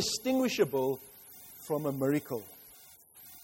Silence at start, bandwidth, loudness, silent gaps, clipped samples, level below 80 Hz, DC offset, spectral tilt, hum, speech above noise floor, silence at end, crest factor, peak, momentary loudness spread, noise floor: 0 s; 16.5 kHz; -32 LUFS; none; under 0.1%; -68 dBFS; under 0.1%; -4.5 dB/octave; none; 25 dB; 0 s; 18 dB; -14 dBFS; 22 LU; -56 dBFS